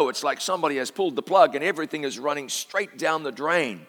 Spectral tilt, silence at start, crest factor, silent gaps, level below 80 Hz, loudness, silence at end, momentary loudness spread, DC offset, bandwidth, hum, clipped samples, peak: -3 dB/octave; 0 s; 20 dB; none; -88 dBFS; -24 LUFS; 0.05 s; 9 LU; under 0.1%; 19.5 kHz; none; under 0.1%; -4 dBFS